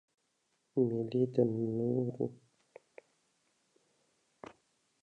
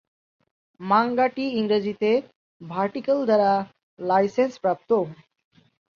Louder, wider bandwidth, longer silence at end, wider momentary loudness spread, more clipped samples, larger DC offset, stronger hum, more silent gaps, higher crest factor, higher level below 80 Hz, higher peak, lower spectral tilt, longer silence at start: second, -34 LUFS vs -23 LUFS; first, 9 kHz vs 7.2 kHz; first, 2.7 s vs 0.8 s; first, 23 LU vs 12 LU; neither; neither; neither; second, none vs 2.36-2.60 s, 3.83-3.97 s; about the same, 22 dB vs 18 dB; second, -78 dBFS vs -68 dBFS; second, -16 dBFS vs -6 dBFS; first, -10 dB/octave vs -7 dB/octave; about the same, 0.75 s vs 0.8 s